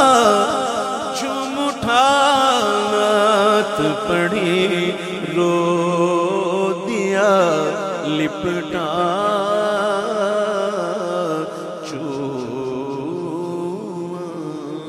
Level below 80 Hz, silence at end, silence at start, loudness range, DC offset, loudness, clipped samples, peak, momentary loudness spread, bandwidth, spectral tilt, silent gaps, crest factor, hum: -56 dBFS; 0 s; 0 s; 8 LU; under 0.1%; -19 LUFS; under 0.1%; -2 dBFS; 11 LU; 15.5 kHz; -4.5 dB/octave; none; 18 dB; none